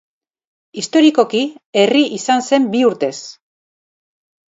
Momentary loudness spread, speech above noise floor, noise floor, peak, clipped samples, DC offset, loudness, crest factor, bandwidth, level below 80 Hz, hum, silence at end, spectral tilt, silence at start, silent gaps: 15 LU; over 75 dB; under -90 dBFS; 0 dBFS; under 0.1%; under 0.1%; -15 LUFS; 16 dB; 8 kHz; -70 dBFS; none; 1.2 s; -4 dB/octave; 0.75 s; 1.66-1.73 s